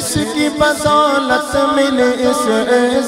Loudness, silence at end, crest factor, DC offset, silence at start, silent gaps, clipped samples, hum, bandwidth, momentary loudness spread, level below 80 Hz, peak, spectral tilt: -14 LUFS; 0 s; 14 dB; under 0.1%; 0 s; none; under 0.1%; none; 16 kHz; 3 LU; -42 dBFS; 0 dBFS; -3.5 dB/octave